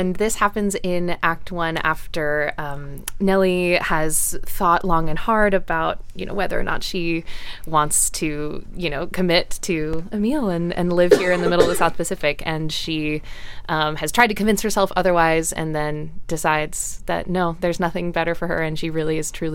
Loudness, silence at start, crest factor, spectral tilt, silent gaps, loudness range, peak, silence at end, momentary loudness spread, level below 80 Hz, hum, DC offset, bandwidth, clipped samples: -21 LUFS; 0 s; 18 dB; -4 dB/octave; none; 3 LU; -2 dBFS; 0 s; 9 LU; -34 dBFS; none; under 0.1%; 17 kHz; under 0.1%